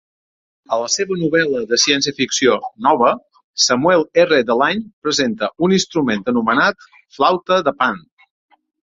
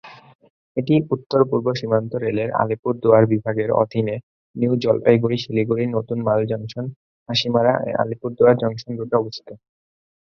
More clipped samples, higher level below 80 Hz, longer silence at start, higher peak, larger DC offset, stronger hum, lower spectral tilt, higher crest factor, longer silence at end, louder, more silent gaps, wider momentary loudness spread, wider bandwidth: neither; about the same, -58 dBFS vs -58 dBFS; first, 0.7 s vs 0.05 s; about the same, -2 dBFS vs 0 dBFS; neither; neither; second, -3 dB/octave vs -7.5 dB/octave; about the same, 16 dB vs 20 dB; first, 0.85 s vs 0.7 s; first, -16 LUFS vs -20 LUFS; second, 3.44-3.54 s, 4.93-5.02 s vs 0.35-0.39 s, 0.50-0.75 s, 2.79-2.83 s, 4.23-4.54 s, 6.96-7.26 s; second, 6 LU vs 12 LU; first, 7.8 kHz vs 7 kHz